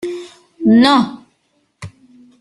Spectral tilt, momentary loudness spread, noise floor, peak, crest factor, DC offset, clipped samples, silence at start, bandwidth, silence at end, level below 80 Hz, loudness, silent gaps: -5.5 dB/octave; 26 LU; -63 dBFS; 0 dBFS; 16 dB; under 0.1%; under 0.1%; 0.05 s; 11.5 kHz; 0.5 s; -56 dBFS; -13 LUFS; none